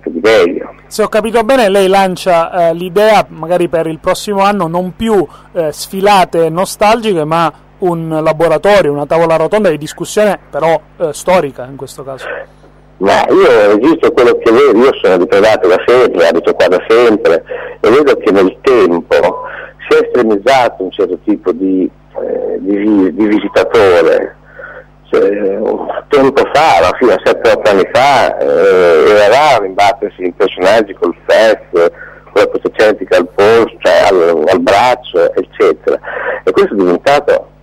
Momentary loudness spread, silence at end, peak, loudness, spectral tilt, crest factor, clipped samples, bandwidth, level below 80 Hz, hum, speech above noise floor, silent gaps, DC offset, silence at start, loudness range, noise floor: 9 LU; 0.2 s; -2 dBFS; -10 LUFS; -5 dB/octave; 8 dB; under 0.1%; 16 kHz; -42 dBFS; 50 Hz at -45 dBFS; 22 dB; none; under 0.1%; 0.05 s; 4 LU; -32 dBFS